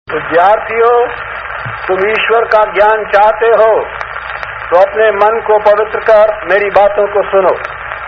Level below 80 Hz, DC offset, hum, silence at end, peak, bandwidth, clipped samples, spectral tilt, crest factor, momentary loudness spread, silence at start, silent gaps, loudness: -40 dBFS; under 0.1%; none; 0 s; 0 dBFS; 6.2 kHz; 0.4%; -6 dB/octave; 10 dB; 12 LU; 0.1 s; none; -10 LUFS